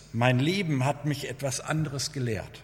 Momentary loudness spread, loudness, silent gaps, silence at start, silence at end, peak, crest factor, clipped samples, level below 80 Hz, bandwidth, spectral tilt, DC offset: 7 LU; -28 LUFS; none; 0 s; 0 s; -6 dBFS; 22 dB; under 0.1%; -56 dBFS; 16.5 kHz; -5 dB/octave; under 0.1%